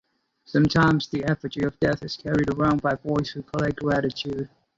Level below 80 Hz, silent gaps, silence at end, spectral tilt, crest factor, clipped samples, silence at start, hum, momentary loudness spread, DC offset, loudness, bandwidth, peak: -48 dBFS; none; 0.3 s; -7 dB/octave; 16 dB; under 0.1%; 0.5 s; none; 9 LU; under 0.1%; -24 LUFS; 7.8 kHz; -8 dBFS